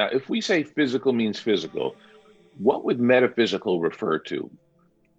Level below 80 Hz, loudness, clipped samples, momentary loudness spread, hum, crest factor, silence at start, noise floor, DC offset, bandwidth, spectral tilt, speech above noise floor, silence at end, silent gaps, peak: -70 dBFS; -24 LUFS; under 0.1%; 11 LU; none; 18 dB; 0 s; -63 dBFS; under 0.1%; 8 kHz; -5.5 dB/octave; 39 dB; 0.75 s; none; -6 dBFS